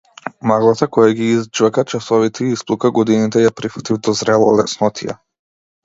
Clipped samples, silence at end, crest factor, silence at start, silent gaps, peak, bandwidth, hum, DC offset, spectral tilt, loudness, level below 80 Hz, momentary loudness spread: under 0.1%; 0.7 s; 16 dB; 0.25 s; none; 0 dBFS; 7.8 kHz; none; under 0.1%; -5.5 dB/octave; -15 LUFS; -56 dBFS; 9 LU